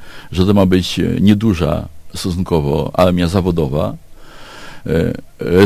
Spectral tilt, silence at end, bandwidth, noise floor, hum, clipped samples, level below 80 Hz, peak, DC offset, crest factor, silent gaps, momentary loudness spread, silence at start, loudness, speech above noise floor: -7 dB/octave; 0 s; 15.5 kHz; -34 dBFS; none; under 0.1%; -30 dBFS; 0 dBFS; under 0.1%; 16 dB; none; 13 LU; 0 s; -16 LUFS; 20 dB